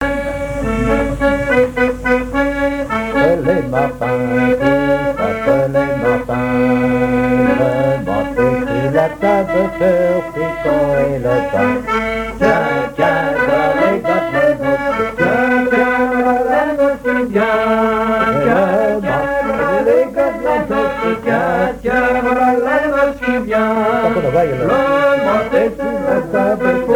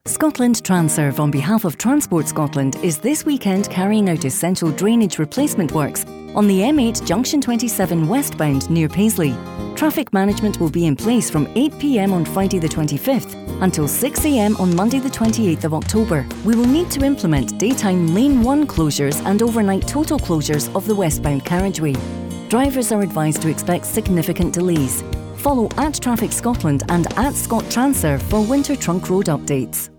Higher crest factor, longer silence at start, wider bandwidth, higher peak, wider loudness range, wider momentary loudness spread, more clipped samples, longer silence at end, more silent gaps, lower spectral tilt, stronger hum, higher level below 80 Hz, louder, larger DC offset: about the same, 14 dB vs 12 dB; about the same, 0 s vs 0.05 s; about the same, 19 kHz vs over 20 kHz; first, 0 dBFS vs -6 dBFS; about the same, 1 LU vs 2 LU; about the same, 4 LU vs 4 LU; neither; about the same, 0 s vs 0.1 s; neither; first, -7 dB/octave vs -5.5 dB/octave; neither; about the same, -34 dBFS vs -36 dBFS; first, -15 LUFS vs -18 LUFS; neither